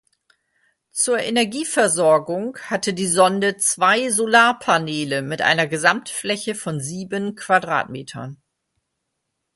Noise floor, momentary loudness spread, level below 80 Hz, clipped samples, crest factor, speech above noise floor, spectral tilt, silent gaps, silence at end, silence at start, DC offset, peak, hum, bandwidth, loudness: -77 dBFS; 11 LU; -64 dBFS; under 0.1%; 20 dB; 57 dB; -3 dB/octave; none; 1.2 s; 0.95 s; under 0.1%; 0 dBFS; none; 12 kHz; -19 LUFS